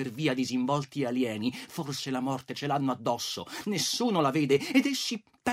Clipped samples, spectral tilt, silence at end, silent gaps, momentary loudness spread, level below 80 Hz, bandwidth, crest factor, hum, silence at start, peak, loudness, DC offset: under 0.1%; -4.5 dB/octave; 0 s; none; 8 LU; -72 dBFS; 16 kHz; 18 dB; none; 0 s; -12 dBFS; -29 LUFS; under 0.1%